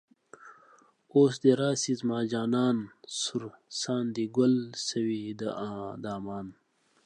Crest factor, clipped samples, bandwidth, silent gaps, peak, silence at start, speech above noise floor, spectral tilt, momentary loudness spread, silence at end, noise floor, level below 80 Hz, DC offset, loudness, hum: 20 dB; under 0.1%; 10 kHz; none; -10 dBFS; 0.45 s; 32 dB; -5 dB/octave; 13 LU; 0.55 s; -61 dBFS; -70 dBFS; under 0.1%; -29 LUFS; none